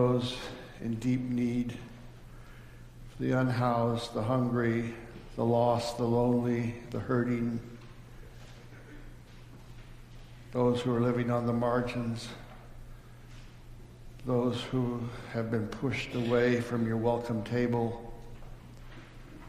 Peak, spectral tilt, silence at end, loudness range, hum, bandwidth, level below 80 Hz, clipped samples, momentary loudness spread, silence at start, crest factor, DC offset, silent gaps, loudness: -14 dBFS; -7 dB/octave; 0 s; 6 LU; none; 14.5 kHz; -50 dBFS; under 0.1%; 23 LU; 0 s; 18 dB; under 0.1%; none; -31 LUFS